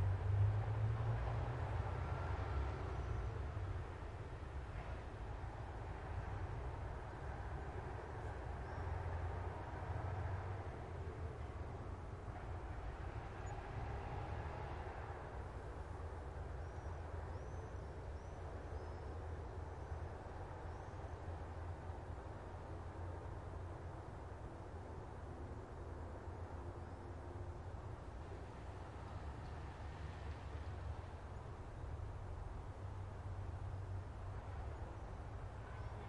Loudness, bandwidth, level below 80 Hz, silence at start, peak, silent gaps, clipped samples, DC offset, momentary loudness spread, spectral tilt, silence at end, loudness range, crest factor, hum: -48 LUFS; 11 kHz; -52 dBFS; 0 s; -26 dBFS; none; under 0.1%; under 0.1%; 8 LU; -7.5 dB/octave; 0 s; 6 LU; 18 dB; none